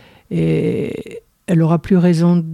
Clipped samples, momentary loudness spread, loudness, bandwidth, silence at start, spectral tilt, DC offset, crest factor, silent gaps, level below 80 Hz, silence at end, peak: under 0.1%; 16 LU; -16 LUFS; 11 kHz; 0.3 s; -8.5 dB/octave; under 0.1%; 12 dB; none; -46 dBFS; 0 s; -4 dBFS